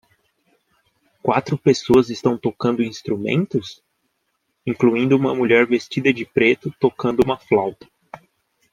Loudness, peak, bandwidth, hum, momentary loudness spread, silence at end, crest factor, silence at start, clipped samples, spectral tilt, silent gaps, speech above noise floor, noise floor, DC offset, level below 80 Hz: -19 LUFS; -2 dBFS; 10.5 kHz; none; 9 LU; 0.55 s; 18 dB; 1.25 s; under 0.1%; -6.5 dB/octave; none; 53 dB; -72 dBFS; under 0.1%; -54 dBFS